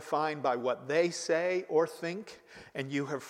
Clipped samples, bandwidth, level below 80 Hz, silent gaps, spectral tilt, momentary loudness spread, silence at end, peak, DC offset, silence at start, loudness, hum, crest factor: under 0.1%; 15 kHz; -78 dBFS; none; -4.5 dB/octave; 13 LU; 0 s; -16 dBFS; under 0.1%; 0 s; -32 LUFS; none; 18 dB